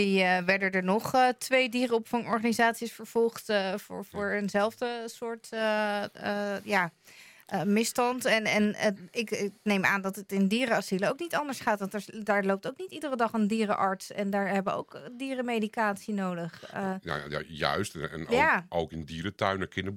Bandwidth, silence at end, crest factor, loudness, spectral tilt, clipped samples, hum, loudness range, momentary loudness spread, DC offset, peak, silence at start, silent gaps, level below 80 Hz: 16.5 kHz; 0 s; 20 dB; -29 LUFS; -4.5 dB/octave; under 0.1%; none; 4 LU; 11 LU; under 0.1%; -8 dBFS; 0 s; none; -66 dBFS